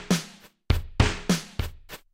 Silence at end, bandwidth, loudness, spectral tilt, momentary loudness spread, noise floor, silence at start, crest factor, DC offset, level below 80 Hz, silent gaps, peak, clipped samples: 0.15 s; 16.5 kHz; -27 LUFS; -5 dB/octave; 16 LU; -47 dBFS; 0 s; 20 dB; under 0.1%; -34 dBFS; none; -6 dBFS; under 0.1%